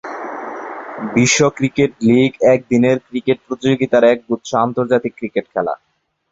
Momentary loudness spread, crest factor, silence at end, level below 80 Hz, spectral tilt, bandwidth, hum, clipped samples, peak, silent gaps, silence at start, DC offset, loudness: 14 LU; 14 dB; 0.55 s; -52 dBFS; -5 dB/octave; 8 kHz; none; under 0.1%; -2 dBFS; none; 0.05 s; under 0.1%; -16 LUFS